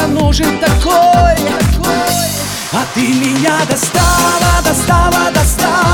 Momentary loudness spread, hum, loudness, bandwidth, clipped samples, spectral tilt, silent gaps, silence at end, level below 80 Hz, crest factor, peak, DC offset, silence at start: 5 LU; none; -11 LUFS; 19.5 kHz; under 0.1%; -4 dB/octave; none; 0 s; -20 dBFS; 10 dB; 0 dBFS; under 0.1%; 0 s